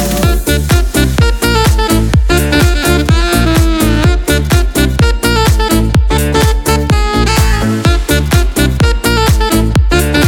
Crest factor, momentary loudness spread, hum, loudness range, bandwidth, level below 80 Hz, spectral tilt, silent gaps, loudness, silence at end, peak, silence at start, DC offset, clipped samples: 10 dB; 2 LU; none; 1 LU; 18.5 kHz; -14 dBFS; -5 dB/octave; none; -11 LUFS; 0 s; 0 dBFS; 0 s; under 0.1%; under 0.1%